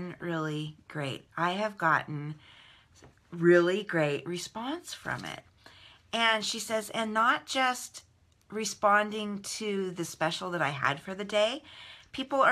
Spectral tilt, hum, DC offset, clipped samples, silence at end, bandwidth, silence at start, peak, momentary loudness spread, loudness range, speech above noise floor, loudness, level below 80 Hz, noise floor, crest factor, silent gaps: -4 dB/octave; none; under 0.1%; under 0.1%; 0 s; 15 kHz; 0 s; -10 dBFS; 15 LU; 3 LU; 29 dB; -30 LUFS; -70 dBFS; -58 dBFS; 20 dB; none